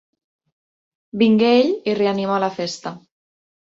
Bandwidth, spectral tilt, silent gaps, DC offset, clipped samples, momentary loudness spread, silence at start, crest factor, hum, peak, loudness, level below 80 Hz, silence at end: 7.8 kHz; -6 dB/octave; none; under 0.1%; under 0.1%; 16 LU; 1.15 s; 16 dB; none; -4 dBFS; -18 LUFS; -66 dBFS; 0.8 s